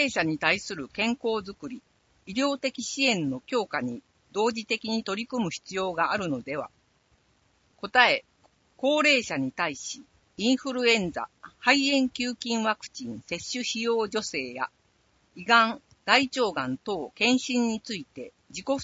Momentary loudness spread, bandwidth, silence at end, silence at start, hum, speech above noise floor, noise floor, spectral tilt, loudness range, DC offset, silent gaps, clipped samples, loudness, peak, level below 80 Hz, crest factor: 16 LU; 8 kHz; 0 s; 0 s; none; 39 dB; -67 dBFS; -3 dB/octave; 5 LU; under 0.1%; none; under 0.1%; -26 LUFS; -2 dBFS; -66 dBFS; 26 dB